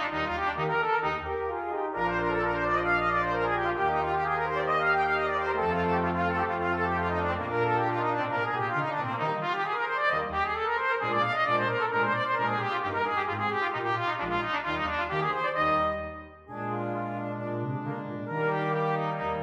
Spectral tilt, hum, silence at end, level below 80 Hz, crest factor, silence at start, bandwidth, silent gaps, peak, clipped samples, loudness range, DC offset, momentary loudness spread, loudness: -7 dB/octave; none; 0 s; -52 dBFS; 14 dB; 0 s; 9.8 kHz; none; -14 dBFS; under 0.1%; 3 LU; under 0.1%; 7 LU; -28 LUFS